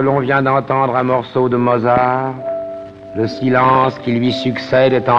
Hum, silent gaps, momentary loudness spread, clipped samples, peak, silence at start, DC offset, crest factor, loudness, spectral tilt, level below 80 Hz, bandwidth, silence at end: none; none; 11 LU; under 0.1%; -2 dBFS; 0 s; under 0.1%; 14 dB; -15 LUFS; -8 dB/octave; -50 dBFS; 7.6 kHz; 0 s